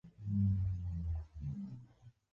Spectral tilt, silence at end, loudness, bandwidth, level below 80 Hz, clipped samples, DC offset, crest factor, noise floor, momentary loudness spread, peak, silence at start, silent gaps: -11 dB/octave; 0.25 s; -39 LUFS; 2 kHz; -46 dBFS; under 0.1%; under 0.1%; 14 dB; -61 dBFS; 13 LU; -24 dBFS; 0.05 s; none